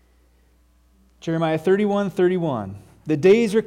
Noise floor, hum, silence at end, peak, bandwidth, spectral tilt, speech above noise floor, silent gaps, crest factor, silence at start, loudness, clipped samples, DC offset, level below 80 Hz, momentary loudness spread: -58 dBFS; none; 0 s; -6 dBFS; 11.5 kHz; -7 dB/octave; 38 dB; none; 16 dB; 1.25 s; -20 LUFS; under 0.1%; under 0.1%; -58 dBFS; 17 LU